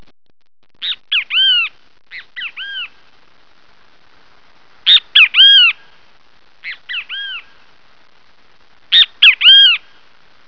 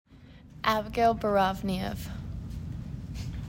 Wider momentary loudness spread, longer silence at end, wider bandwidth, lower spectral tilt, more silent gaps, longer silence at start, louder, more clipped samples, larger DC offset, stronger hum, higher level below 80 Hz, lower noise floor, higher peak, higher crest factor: first, 24 LU vs 14 LU; first, 0.7 s vs 0 s; second, 5.4 kHz vs 16.5 kHz; second, 2 dB/octave vs -6 dB/octave; neither; first, 0.8 s vs 0.1 s; first, -8 LUFS vs -30 LUFS; neither; first, 0.8% vs under 0.1%; neither; second, -64 dBFS vs -44 dBFS; about the same, -53 dBFS vs -51 dBFS; first, 0 dBFS vs -10 dBFS; about the same, 16 dB vs 20 dB